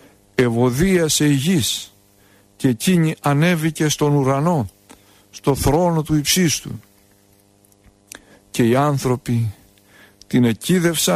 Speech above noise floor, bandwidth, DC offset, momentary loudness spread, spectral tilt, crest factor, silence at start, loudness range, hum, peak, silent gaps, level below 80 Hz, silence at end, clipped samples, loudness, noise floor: 37 dB; 15.5 kHz; under 0.1%; 8 LU; -5 dB/octave; 16 dB; 0.4 s; 4 LU; none; -4 dBFS; none; -42 dBFS; 0 s; under 0.1%; -18 LUFS; -55 dBFS